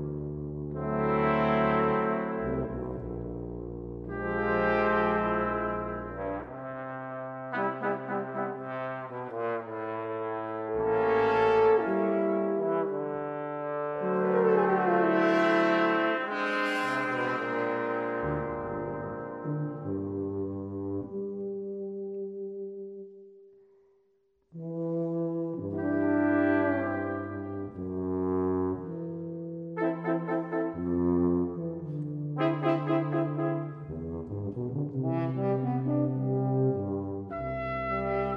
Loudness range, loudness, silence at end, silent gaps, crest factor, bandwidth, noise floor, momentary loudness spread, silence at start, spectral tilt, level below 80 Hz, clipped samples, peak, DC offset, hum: 9 LU; -30 LUFS; 0 s; none; 18 dB; 9.8 kHz; -70 dBFS; 12 LU; 0 s; -8.5 dB/octave; -54 dBFS; under 0.1%; -12 dBFS; under 0.1%; none